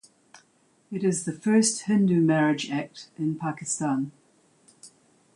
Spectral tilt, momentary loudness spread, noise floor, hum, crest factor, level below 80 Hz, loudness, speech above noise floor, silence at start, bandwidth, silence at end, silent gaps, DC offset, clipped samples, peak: -5 dB/octave; 11 LU; -64 dBFS; none; 16 dB; -72 dBFS; -25 LUFS; 40 dB; 0.9 s; 11.5 kHz; 0.5 s; none; under 0.1%; under 0.1%; -10 dBFS